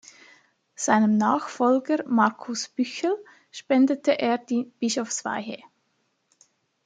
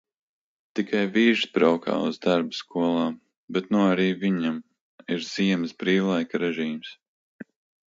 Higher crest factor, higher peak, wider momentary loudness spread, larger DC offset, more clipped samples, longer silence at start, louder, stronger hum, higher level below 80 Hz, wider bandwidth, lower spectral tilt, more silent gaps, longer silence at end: about the same, 20 dB vs 18 dB; about the same, -6 dBFS vs -6 dBFS; about the same, 12 LU vs 11 LU; neither; neither; about the same, 0.8 s vs 0.75 s; about the same, -24 LUFS vs -25 LUFS; neither; second, -76 dBFS vs -70 dBFS; first, 9.4 kHz vs 7.8 kHz; second, -4 dB/octave vs -6 dB/octave; second, none vs 3.37-3.48 s, 4.81-4.98 s, 7.08-7.39 s; first, 1.3 s vs 0.5 s